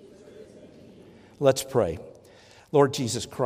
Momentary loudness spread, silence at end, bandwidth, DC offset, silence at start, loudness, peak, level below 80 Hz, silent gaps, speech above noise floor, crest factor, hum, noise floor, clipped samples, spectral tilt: 11 LU; 0 s; 15.5 kHz; under 0.1%; 0.25 s; -25 LUFS; -6 dBFS; -60 dBFS; none; 29 dB; 22 dB; none; -53 dBFS; under 0.1%; -5 dB/octave